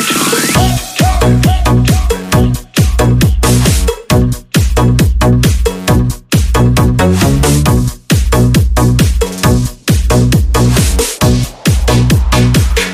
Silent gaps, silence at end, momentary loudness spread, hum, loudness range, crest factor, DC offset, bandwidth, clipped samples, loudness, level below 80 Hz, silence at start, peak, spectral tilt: none; 0 s; 4 LU; none; 1 LU; 10 dB; under 0.1%; 16 kHz; under 0.1%; -11 LUFS; -16 dBFS; 0 s; 0 dBFS; -5 dB/octave